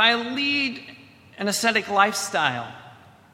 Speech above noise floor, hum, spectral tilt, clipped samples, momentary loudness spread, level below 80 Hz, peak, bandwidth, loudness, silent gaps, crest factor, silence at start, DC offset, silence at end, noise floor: 25 dB; none; -2 dB/octave; under 0.1%; 16 LU; -68 dBFS; -2 dBFS; 16 kHz; -22 LUFS; none; 22 dB; 0 s; under 0.1%; 0.4 s; -48 dBFS